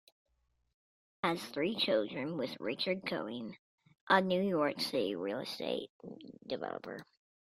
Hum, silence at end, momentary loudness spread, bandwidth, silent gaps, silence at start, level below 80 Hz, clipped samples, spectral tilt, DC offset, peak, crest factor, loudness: none; 0.4 s; 17 LU; 16 kHz; 3.59-3.78 s, 4.01-4.07 s, 5.90-6.00 s; 1.25 s; -76 dBFS; under 0.1%; -5 dB/octave; under 0.1%; -12 dBFS; 24 dB; -35 LUFS